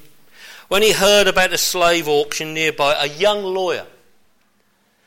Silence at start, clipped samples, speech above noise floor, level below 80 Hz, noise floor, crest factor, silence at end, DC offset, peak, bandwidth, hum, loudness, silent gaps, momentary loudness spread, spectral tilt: 0.4 s; under 0.1%; 45 dB; -46 dBFS; -62 dBFS; 16 dB; 1.2 s; under 0.1%; -4 dBFS; 17 kHz; none; -16 LUFS; none; 9 LU; -2 dB/octave